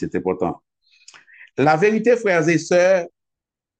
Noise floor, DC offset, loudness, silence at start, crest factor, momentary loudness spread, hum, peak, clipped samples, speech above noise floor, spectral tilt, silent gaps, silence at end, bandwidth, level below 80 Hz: -85 dBFS; under 0.1%; -18 LUFS; 0 s; 16 dB; 14 LU; none; -4 dBFS; under 0.1%; 68 dB; -5.5 dB/octave; none; 0.7 s; 9 kHz; -60 dBFS